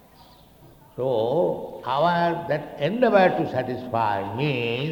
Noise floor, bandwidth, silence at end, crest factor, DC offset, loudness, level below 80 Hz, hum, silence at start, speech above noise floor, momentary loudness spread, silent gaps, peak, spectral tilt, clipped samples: -51 dBFS; 19.5 kHz; 0 s; 20 dB; under 0.1%; -23 LUFS; -58 dBFS; none; 0.65 s; 28 dB; 9 LU; none; -4 dBFS; -7.5 dB/octave; under 0.1%